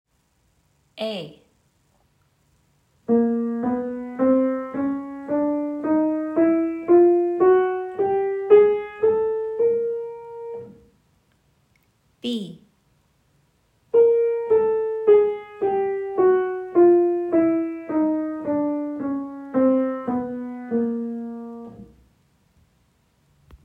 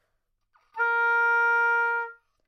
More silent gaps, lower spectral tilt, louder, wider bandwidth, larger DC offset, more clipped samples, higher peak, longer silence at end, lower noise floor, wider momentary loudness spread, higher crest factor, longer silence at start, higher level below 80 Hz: neither; first, -8 dB/octave vs 0.5 dB/octave; about the same, -21 LUFS vs -23 LUFS; second, 5.2 kHz vs 6.4 kHz; neither; neither; first, -2 dBFS vs -14 dBFS; first, 1.8 s vs 0.35 s; second, -66 dBFS vs -75 dBFS; first, 16 LU vs 12 LU; first, 20 dB vs 12 dB; first, 0.95 s vs 0.75 s; first, -64 dBFS vs -78 dBFS